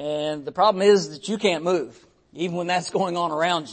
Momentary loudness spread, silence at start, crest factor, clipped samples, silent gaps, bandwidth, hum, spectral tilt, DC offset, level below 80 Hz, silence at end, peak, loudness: 10 LU; 0 s; 16 dB; under 0.1%; none; 8.8 kHz; none; -4.5 dB/octave; under 0.1%; -66 dBFS; 0 s; -6 dBFS; -23 LUFS